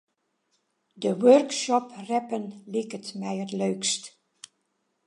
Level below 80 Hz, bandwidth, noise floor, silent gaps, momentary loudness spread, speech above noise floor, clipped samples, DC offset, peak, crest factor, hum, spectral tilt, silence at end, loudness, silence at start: -82 dBFS; 11.5 kHz; -75 dBFS; none; 15 LU; 50 dB; under 0.1%; under 0.1%; -6 dBFS; 22 dB; none; -4 dB/octave; 1 s; -26 LUFS; 0.95 s